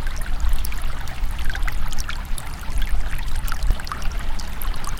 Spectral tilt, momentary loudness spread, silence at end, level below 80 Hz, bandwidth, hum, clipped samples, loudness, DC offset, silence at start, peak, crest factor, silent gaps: -3.5 dB/octave; 4 LU; 0 s; -22 dBFS; 17 kHz; none; under 0.1%; -29 LUFS; under 0.1%; 0 s; -6 dBFS; 14 dB; none